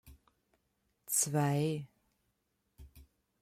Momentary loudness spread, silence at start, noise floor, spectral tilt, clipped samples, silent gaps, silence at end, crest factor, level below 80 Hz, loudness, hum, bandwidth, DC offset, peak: 12 LU; 0.05 s; -81 dBFS; -4.5 dB/octave; under 0.1%; none; 0.4 s; 20 dB; -66 dBFS; -33 LUFS; none; 16 kHz; under 0.1%; -18 dBFS